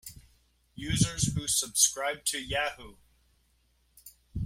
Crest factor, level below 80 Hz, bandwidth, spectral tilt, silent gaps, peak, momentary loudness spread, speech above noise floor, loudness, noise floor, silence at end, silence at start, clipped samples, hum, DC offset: 22 dB; -50 dBFS; 16.5 kHz; -2.5 dB/octave; none; -10 dBFS; 19 LU; 39 dB; -28 LUFS; -69 dBFS; 0 s; 0.05 s; under 0.1%; 60 Hz at -60 dBFS; under 0.1%